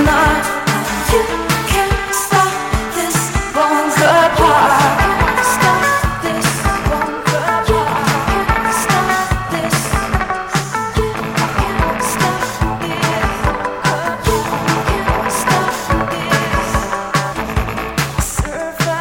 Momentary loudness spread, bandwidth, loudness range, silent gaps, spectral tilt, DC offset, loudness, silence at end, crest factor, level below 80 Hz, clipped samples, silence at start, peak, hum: 7 LU; 17 kHz; 5 LU; none; -4 dB/octave; under 0.1%; -15 LUFS; 0 s; 14 dB; -26 dBFS; under 0.1%; 0 s; -2 dBFS; none